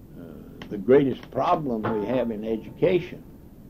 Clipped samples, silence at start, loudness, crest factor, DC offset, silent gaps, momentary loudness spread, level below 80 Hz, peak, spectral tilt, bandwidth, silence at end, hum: under 0.1%; 0 s; -24 LUFS; 18 dB; under 0.1%; none; 22 LU; -50 dBFS; -8 dBFS; -8.5 dB/octave; 15 kHz; 0 s; none